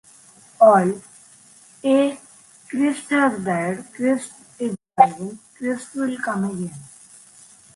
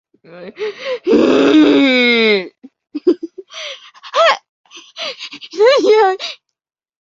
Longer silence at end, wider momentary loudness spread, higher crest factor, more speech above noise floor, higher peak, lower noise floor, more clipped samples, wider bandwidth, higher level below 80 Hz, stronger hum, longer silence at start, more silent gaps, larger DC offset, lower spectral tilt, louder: first, 0.9 s vs 0.65 s; about the same, 17 LU vs 19 LU; first, 22 dB vs 14 dB; second, 29 dB vs 65 dB; about the same, 0 dBFS vs 0 dBFS; second, -50 dBFS vs -78 dBFS; neither; first, 11.5 kHz vs 7.6 kHz; second, -66 dBFS vs -58 dBFS; neither; first, 0.6 s vs 0.3 s; second, none vs 4.49-4.64 s; neither; first, -6 dB/octave vs -4 dB/octave; second, -21 LUFS vs -13 LUFS